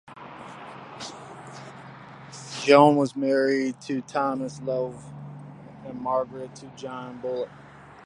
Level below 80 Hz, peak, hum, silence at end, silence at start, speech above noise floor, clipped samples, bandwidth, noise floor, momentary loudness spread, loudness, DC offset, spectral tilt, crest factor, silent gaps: -66 dBFS; -2 dBFS; none; 0.15 s; 0.1 s; 20 dB; under 0.1%; 11 kHz; -44 dBFS; 23 LU; -24 LUFS; under 0.1%; -5.5 dB/octave; 24 dB; none